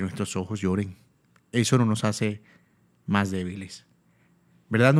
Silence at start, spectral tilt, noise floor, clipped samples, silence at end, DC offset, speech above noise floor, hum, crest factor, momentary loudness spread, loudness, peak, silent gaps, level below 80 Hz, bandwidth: 0 s; -5.5 dB/octave; -63 dBFS; under 0.1%; 0 s; under 0.1%; 38 dB; none; 22 dB; 18 LU; -26 LUFS; -4 dBFS; none; -62 dBFS; 14 kHz